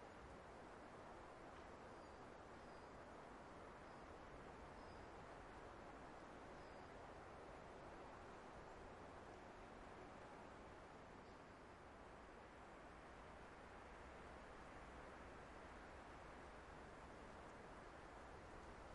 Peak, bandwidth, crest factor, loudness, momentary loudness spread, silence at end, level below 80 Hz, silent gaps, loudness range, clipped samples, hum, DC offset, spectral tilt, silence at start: -46 dBFS; 11 kHz; 14 dB; -60 LUFS; 2 LU; 0 s; -70 dBFS; none; 2 LU; under 0.1%; none; under 0.1%; -5.5 dB/octave; 0 s